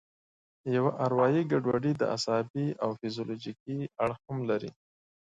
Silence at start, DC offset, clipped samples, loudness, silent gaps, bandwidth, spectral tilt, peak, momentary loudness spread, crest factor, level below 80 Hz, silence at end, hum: 0.65 s; under 0.1%; under 0.1%; -30 LUFS; 2.50-2.54 s, 3.60-3.66 s; 9.4 kHz; -6.5 dB/octave; -12 dBFS; 11 LU; 18 dB; -68 dBFS; 0.5 s; none